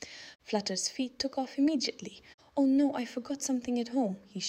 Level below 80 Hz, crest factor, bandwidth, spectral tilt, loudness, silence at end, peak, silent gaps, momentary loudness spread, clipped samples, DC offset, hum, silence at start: -70 dBFS; 16 dB; 12.5 kHz; -3.5 dB/octave; -31 LUFS; 0 s; -16 dBFS; 2.34-2.38 s; 11 LU; under 0.1%; under 0.1%; none; 0 s